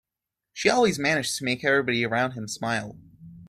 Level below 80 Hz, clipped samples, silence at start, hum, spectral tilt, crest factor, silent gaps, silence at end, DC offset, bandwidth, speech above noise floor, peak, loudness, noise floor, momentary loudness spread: -62 dBFS; under 0.1%; 0.55 s; none; -4 dB/octave; 22 dB; none; 0 s; under 0.1%; 15 kHz; 62 dB; -4 dBFS; -24 LUFS; -87 dBFS; 10 LU